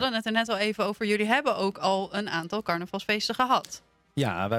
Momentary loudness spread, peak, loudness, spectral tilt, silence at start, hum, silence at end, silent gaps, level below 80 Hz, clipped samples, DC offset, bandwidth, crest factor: 6 LU; -8 dBFS; -27 LUFS; -4.5 dB/octave; 0 s; none; 0 s; none; -66 dBFS; under 0.1%; under 0.1%; 16 kHz; 18 dB